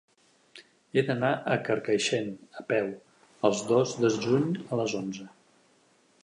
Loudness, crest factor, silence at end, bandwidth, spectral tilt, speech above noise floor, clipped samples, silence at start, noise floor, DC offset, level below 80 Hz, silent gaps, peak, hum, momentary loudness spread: -28 LUFS; 22 dB; 0.95 s; 11 kHz; -5 dB/octave; 37 dB; under 0.1%; 0.55 s; -64 dBFS; under 0.1%; -72 dBFS; none; -8 dBFS; none; 12 LU